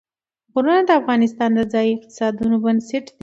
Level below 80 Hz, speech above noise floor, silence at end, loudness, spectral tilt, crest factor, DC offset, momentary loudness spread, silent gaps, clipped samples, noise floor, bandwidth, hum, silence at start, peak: -56 dBFS; 50 dB; 0.15 s; -19 LUFS; -6 dB/octave; 16 dB; under 0.1%; 8 LU; none; under 0.1%; -68 dBFS; 7.8 kHz; none; 0.55 s; -2 dBFS